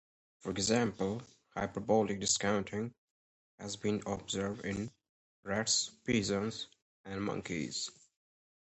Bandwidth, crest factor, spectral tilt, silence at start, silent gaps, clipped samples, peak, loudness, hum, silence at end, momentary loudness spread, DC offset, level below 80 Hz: 8.4 kHz; 22 dB; -3.5 dB/octave; 0.45 s; 2.98-3.58 s, 5.09-5.43 s, 6.82-7.04 s; under 0.1%; -16 dBFS; -35 LUFS; none; 0.75 s; 14 LU; under 0.1%; -62 dBFS